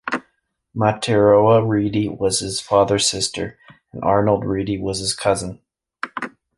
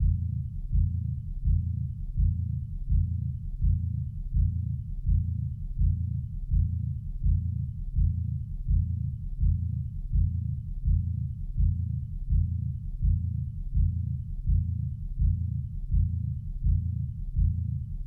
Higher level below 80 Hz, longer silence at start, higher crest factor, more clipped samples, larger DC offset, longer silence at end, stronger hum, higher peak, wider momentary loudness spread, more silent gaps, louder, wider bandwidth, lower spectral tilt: second, -46 dBFS vs -32 dBFS; about the same, 0.05 s vs 0 s; first, 18 dB vs 12 dB; neither; neither; first, 0.3 s vs 0 s; neither; first, -2 dBFS vs -16 dBFS; first, 16 LU vs 6 LU; neither; first, -19 LUFS vs -31 LUFS; first, 11.5 kHz vs 0.5 kHz; second, -4.5 dB/octave vs -12.5 dB/octave